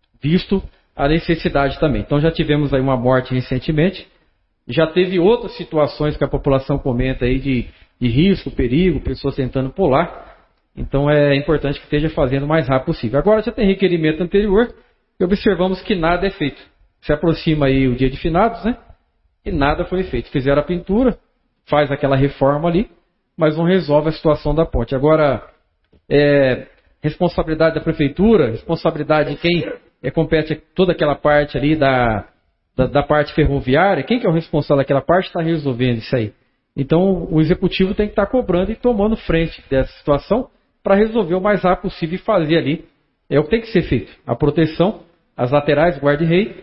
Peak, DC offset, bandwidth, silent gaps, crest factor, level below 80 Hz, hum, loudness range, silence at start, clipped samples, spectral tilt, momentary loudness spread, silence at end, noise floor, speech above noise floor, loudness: -2 dBFS; under 0.1%; 5.8 kHz; none; 16 dB; -32 dBFS; none; 2 LU; 0.25 s; under 0.1%; -12 dB/octave; 8 LU; 0.1 s; -62 dBFS; 45 dB; -17 LUFS